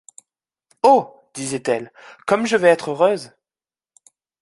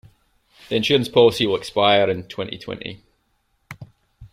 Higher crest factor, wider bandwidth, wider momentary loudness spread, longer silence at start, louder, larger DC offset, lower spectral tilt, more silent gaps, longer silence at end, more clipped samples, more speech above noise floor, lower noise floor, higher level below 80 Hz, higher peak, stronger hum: about the same, 18 dB vs 20 dB; second, 11.5 kHz vs 14.5 kHz; second, 15 LU vs 21 LU; first, 0.85 s vs 0.7 s; about the same, -19 LUFS vs -19 LUFS; neither; about the same, -4.5 dB/octave vs -5 dB/octave; neither; first, 1.15 s vs 0.05 s; neither; first, over 72 dB vs 48 dB; first, under -90 dBFS vs -67 dBFS; second, -68 dBFS vs -54 dBFS; about the same, -2 dBFS vs -2 dBFS; neither